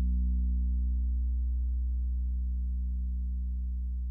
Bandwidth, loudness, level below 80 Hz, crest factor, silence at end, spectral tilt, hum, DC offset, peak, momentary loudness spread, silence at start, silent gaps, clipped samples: 0.3 kHz; -33 LUFS; -30 dBFS; 6 dB; 0 s; -12.5 dB/octave; none; under 0.1%; -24 dBFS; 5 LU; 0 s; none; under 0.1%